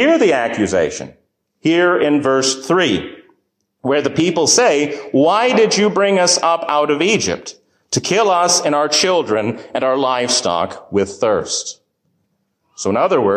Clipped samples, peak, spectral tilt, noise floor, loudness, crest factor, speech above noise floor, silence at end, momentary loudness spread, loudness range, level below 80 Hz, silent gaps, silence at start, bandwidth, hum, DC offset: under 0.1%; -2 dBFS; -3 dB/octave; -67 dBFS; -15 LUFS; 14 dB; 52 dB; 0 s; 9 LU; 5 LU; -52 dBFS; none; 0 s; 15 kHz; none; under 0.1%